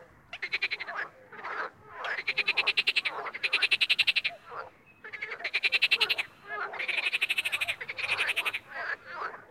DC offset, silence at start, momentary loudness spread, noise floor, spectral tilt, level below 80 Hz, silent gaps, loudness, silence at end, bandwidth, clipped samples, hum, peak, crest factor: under 0.1%; 0 s; 16 LU; -50 dBFS; 0 dB/octave; -74 dBFS; none; -28 LUFS; 0.05 s; 16 kHz; under 0.1%; none; -10 dBFS; 22 dB